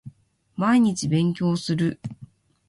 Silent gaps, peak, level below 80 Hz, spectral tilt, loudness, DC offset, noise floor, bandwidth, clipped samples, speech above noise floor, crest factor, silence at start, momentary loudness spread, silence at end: none; -8 dBFS; -58 dBFS; -6 dB/octave; -22 LUFS; under 0.1%; -49 dBFS; 11.5 kHz; under 0.1%; 27 dB; 16 dB; 0.05 s; 18 LU; 0.45 s